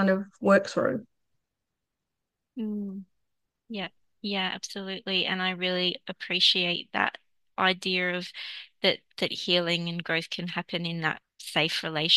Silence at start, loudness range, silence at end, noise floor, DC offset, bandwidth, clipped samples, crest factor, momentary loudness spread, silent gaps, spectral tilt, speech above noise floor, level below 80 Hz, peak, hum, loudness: 0 s; 10 LU; 0 s; -85 dBFS; under 0.1%; 12.5 kHz; under 0.1%; 22 dB; 14 LU; none; -4 dB/octave; 57 dB; -76 dBFS; -6 dBFS; none; -27 LUFS